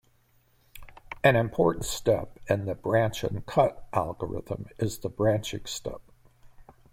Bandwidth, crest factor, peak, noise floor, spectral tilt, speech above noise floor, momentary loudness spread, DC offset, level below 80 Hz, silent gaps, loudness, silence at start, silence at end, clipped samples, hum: 16.5 kHz; 22 dB; -6 dBFS; -64 dBFS; -5.5 dB/octave; 37 dB; 12 LU; under 0.1%; -50 dBFS; none; -28 LUFS; 0.75 s; 0.3 s; under 0.1%; none